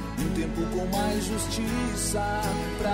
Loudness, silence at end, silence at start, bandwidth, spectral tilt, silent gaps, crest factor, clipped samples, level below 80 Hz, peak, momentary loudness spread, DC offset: -28 LUFS; 0 s; 0 s; 16 kHz; -4.5 dB/octave; none; 12 dB; under 0.1%; -36 dBFS; -16 dBFS; 2 LU; under 0.1%